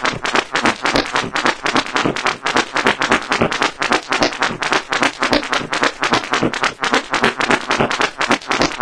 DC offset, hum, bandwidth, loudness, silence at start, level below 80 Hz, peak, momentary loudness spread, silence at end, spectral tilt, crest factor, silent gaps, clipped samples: 0.4%; none; 11 kHz; -17 LUFS; 0 s; -44 dBFS; 0 dBFS; 3 LU; 0 s; -3 dB/octave; 18 dB; none; under 0.1%